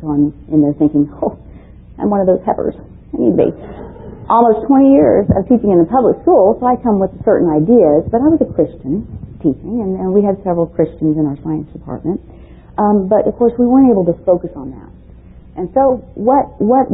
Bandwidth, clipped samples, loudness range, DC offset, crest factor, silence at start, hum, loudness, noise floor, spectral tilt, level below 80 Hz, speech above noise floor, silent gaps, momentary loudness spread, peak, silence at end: 3.9 kHz; under 0.1%; 6 LU; under 0.1%; 14 dB; 0 s; none; -13 LUFS; -38 dBFS; -15 dB/octave; -38 dBFS; 25 dB; none; 14 LU; 0 dBFS; 0 s